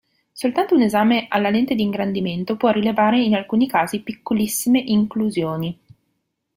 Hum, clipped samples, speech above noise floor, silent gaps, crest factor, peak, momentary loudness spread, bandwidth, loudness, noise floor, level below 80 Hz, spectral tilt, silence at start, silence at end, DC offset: none; under 0.1%; 54 dB; none; 16 dB; -4 dBFS; 8 LU; 16.5 kHz; -19 LUFS; -73 dBFS; -58 dBFS; -5 dB/octave; 0.35 s; 0.85 s; under 0.1%